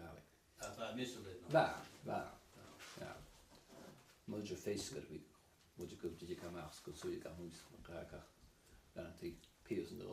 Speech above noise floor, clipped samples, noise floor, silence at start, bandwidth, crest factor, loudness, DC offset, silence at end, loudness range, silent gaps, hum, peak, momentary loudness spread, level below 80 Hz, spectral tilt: 22 dB; under 0.1%; -67 dBFS; 0 s; 15 kHz; 26 dB; -46 LUFS; under 0.1%; 0 s; 8 LU; none; none; -20 dBFS; 18 LU; -70 dBFS; -5 dB/octave